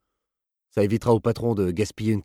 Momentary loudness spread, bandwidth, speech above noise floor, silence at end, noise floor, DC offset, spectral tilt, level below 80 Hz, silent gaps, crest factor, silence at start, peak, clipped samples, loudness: 5 LU; 15 kHz; 63 dB; 0 s; -86 dBFS; under 0.1%; -7.5 dB/octave; -52 dBFS; none; 18 dB; 0.75 s; -6 dBFS; under 0.1%; -24 LUFS